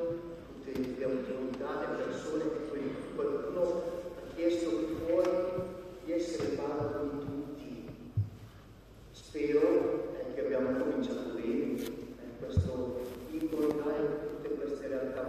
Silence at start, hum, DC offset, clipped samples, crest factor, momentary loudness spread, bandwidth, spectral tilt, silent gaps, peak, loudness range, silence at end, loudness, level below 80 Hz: 0 s; none; under 0.1%; under 0.1%; 18 dB; 13 LU; 14.5 kHz; -7 dB/octave; none; -16 dBFS; 4 LU; 0 s; -35 LUFS; -56 dBFS